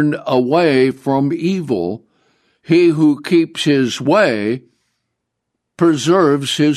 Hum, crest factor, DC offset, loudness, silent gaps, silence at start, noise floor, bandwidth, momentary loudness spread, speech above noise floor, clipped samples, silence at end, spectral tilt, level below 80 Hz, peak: none; 14 dB; under 0.1%; -15 LUFS; none; 0 s; -75 dBFS; 13 kHz; 7 LU; 61 dB; under 0.1%; 0 s; -6 dB/octave; -62 dBFS; -2 dBFS